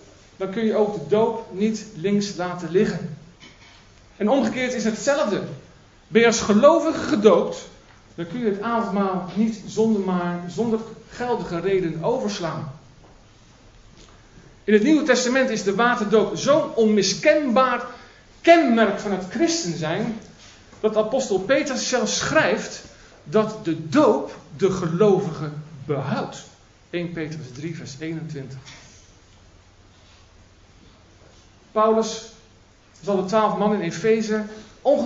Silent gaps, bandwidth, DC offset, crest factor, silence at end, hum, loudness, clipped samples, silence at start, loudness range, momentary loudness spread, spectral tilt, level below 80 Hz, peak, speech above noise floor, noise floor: none; 8 kHz; under 0.1%; 22 dB; 0 s; none; -21 LUFS; under 0.1%; 0.4 s; 11 LU; 16 LU; -5 dB/octave; -56 dBFS; 0 dBFS; 32 dB; -53 dBFS